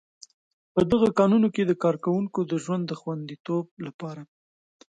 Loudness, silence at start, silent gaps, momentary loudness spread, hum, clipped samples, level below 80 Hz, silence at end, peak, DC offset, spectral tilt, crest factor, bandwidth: -25 LUFS; 0.75 s; 3.40-3.45 s, 3.71-3.77 s, 3.94-3.99 s; 17 LU; none; under 0.1%; -56 dBFS; 0.65 s; -8 dBFS; under 0.1%; -7.5 dB/octave; 18 dB; 9.2 kHz